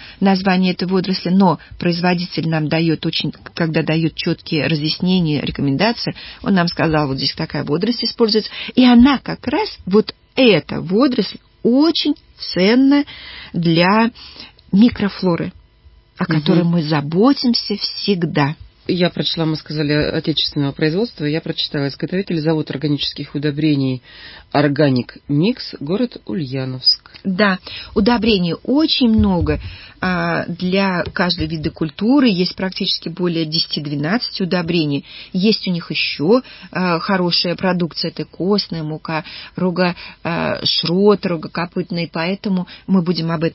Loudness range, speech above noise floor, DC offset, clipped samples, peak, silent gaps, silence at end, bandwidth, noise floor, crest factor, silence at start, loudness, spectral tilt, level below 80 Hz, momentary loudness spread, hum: 3 LU; 31 dB; under 0.1%; under 0.1%; 0 dBFS; none; 0 s; 5.8 kHz; -48 dBFS; 16 dB; 0 s; -17 LUFS; -9.5 dB/octave; -42 dBFS; 9 LU; none